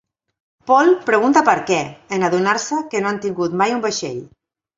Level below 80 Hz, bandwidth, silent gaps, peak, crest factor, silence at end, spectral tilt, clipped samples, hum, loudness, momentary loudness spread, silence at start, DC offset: -62 dBFS; 7.8 kHz; none; 0 dBFS; 18 dB; 0.5 s; -4.5 dB/octave; under 0.1%; none; -17 LUFS; 11 LU; 0.65 s; under 0.1%